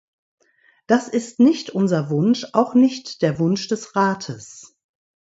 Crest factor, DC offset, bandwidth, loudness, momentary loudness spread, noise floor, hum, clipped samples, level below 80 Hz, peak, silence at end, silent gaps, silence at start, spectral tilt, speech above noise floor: 20 dB; under 0.1%; 8 kHz; -20 LUFS; 10 LU; -60 dBFS; none; under 0.1%; -64 dBFS; -2 dBFS; 0.6 s; none; 0.9 s; -6 dB/octave; 40 dB